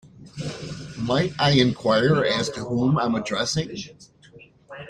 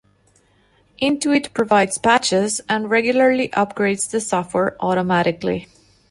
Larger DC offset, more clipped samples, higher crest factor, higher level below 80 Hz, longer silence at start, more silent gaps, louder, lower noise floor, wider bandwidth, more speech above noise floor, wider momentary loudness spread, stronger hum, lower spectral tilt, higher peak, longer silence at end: neither; neither; about the same, 20 dB vs 16 dB; about the same, -52 dBFS vs -56 dBFS; second, 0.05 s vs 1 s; neither; second, -22 LUFS vs -19 LUFS; second, -50 dBFS vs -58 dBFS; about the same, 10.5 kHz vs 11.5 kHz; second, 28 dB vs 39 dB; first, 16 LU vs 6 LU; neither; about the same, -5 dB/octave vs -4 dB/octave; about the same, -4 dBFS vs -4 dBFS; second, 0 s vs 0.45 s